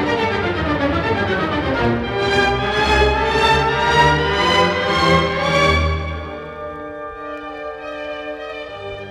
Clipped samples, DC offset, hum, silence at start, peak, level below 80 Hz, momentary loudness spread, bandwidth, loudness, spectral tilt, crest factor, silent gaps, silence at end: under 0.1%; under 0.1%; none; 0 s; -2 dBFS; -30 dBFS; 15 LU; 13.5 kHz; -17 LUFS; -5 dB/octave; 16 dB; none; 0 s